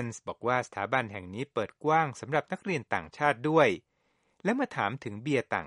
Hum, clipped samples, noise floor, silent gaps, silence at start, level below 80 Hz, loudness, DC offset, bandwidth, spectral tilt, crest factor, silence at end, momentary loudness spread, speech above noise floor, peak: none; under 0.1%; -69 dBFS; none; 0 s; -68 dBFS; -30 LUFS; under 0.1%; 11.5 kHz; -5.5 dB/octave; 22 dB; 0 s; 10 LU; 40 dB; -8 dBFS